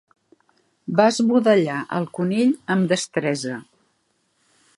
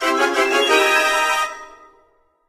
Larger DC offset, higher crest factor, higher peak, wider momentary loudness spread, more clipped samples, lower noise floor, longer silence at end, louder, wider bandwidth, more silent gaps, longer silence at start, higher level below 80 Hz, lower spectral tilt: neither; about the same, 20 dB vs 16 dB; about the same, -2 dBFS vs -2 dBFS; about the same, 10 LU vs 10 LU; neither; first, -68 dBFS vs -59 dBFS; first, 1.15 s vs 0.8 s; second, -20 LUFS vs -16 LUFS; second, 11.5 kHz vs 15 kHz; neither; first, 0.9 s vs 0 s; second, -70 dBFS vs -58 dBFS; first, -5.5 dB/octave vs 0.5 dB/octave